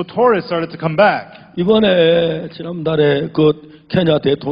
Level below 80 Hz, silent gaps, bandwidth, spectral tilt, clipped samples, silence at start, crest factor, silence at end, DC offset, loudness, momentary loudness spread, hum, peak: -50 dBFS; none; 5.2 kHz; -9.5 dB/octave; under 0.1%; 0 s; 14 dB; 0 s; under 0.1%; -15 LUFS; 11 LU; none; -2 dBFS